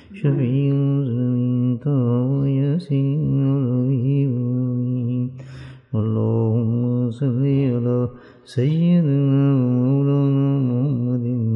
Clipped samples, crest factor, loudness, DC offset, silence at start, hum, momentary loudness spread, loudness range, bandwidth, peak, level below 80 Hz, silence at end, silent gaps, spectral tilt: under 0.1%; 12 dB; -20 LUFS; under 0.1%; 0.1 s; none; 6 LU; 3 LU; 5.2 kHz; -8 dBFS; -56 dBFS; 0 s; none; -11 dB/octave